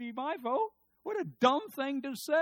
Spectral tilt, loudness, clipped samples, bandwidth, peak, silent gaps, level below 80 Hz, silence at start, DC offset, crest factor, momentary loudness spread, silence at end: -4.5 dB/octave; -33 LUFS; under 0.1%; 18 kHz; -12 dBFS; none; -82 dBFS; 0 s; under 0.1%; 20 dB; 10 LU; 0 s